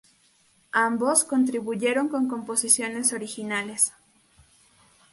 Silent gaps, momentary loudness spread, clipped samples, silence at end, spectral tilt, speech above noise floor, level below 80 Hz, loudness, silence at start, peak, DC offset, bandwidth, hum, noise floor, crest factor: none; 8 LU; under 0.1%; 1.2 s; -2 dB/octave; 38 dB; -70 dBFS; -24 LUFS; 0.75 s; -4 dBFS; under 0.1%; 12 kHz; none; -62 dBFS; 22 dB